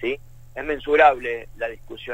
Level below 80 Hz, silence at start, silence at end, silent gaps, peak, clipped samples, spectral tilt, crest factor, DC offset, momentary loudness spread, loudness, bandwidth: -44 dBFS; 0 s; 0 s; none; -4 dBFS; under 0.1%; -5 dB/octave; 20 dB; under 0.1%; 18 LU; -21 LUFS; 15.5 kHz